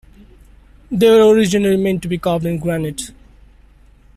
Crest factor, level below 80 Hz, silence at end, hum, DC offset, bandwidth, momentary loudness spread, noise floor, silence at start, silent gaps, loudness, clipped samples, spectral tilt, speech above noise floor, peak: 14 dB; -44 dBFS; 1.05 s; none; under 0.1%; 14 kHz; 15 LU; -47 dBFS; 0.9 s; none; -15 LUFS; under 0.1%; -6 dB/octave; 33 dB; -2 dBFS